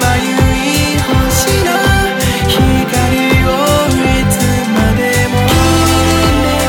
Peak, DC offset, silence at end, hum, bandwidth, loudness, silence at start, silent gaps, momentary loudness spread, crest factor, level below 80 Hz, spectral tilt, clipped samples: 0 dBFS; under 0.1%; 0 s; none; 19.5 kHz; -11 LUFS; 0 s; none; 2 LU; 10 dB; -20 dBFS; -4.5 dB/octave; under 0.1%